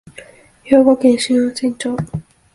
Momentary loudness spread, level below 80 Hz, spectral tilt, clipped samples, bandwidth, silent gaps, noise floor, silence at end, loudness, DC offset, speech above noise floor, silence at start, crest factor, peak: 13 LU; -50 dBFS; -5.5 dB/octave; under 0.1%; 11.5 kHz; none; -42 dBFS; 0.35 s; -15 LUFS; under 0.1%; 28 dB; 0.2 s; 16 dB; 0 dBFS